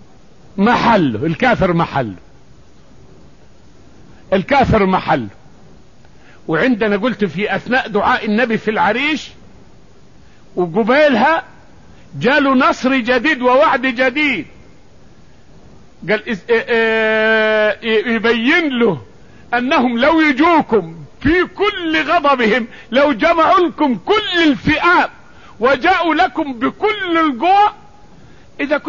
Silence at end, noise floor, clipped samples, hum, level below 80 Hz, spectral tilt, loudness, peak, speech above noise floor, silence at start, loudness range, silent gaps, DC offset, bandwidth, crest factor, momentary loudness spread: 0 s; -46 dBFS; under 0.1%; none; -42 dBFS; -6 dB/octave; -14 LUFS; -2 dBFS; 32 dB; 0.55 s; 5 LU; none; 0.7%; 7.4 kHz; 12 dB; 8 LU